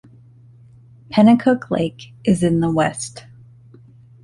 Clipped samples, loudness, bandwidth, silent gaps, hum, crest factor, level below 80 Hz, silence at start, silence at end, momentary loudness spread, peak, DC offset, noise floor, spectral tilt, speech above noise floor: under 0.1%; -18 LUFS; 11.5 kHz; none; none; 18 dB; -50 dBFS; 1.1 s; 1.05 s; 13 LU; -2 dBFS; under 0.1%; -46 dBFS; -6.5 dB/octave; 30 dB